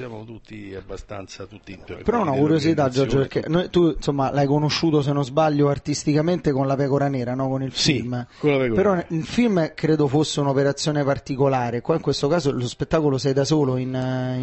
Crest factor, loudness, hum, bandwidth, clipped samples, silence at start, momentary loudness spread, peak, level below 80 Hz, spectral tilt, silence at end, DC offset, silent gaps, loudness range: 16 dB; -21 LUFS; none; 8.6 kHz; under 0.1%; 0 s; 16 LU; -6 dBFS; -46 dBFS; -6 dB/octave; 0 s; under 0.1%; none; 2 LU